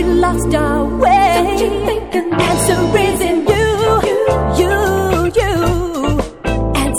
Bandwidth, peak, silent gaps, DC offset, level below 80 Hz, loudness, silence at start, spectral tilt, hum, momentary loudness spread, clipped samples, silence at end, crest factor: 17 kHz; 0 dBFS; none; 0.6%; -24 dBFS; -14 LUFS; 0 s; -5 dB/octave; none; 5 LU; under 0.1%; 0 s; 14 dB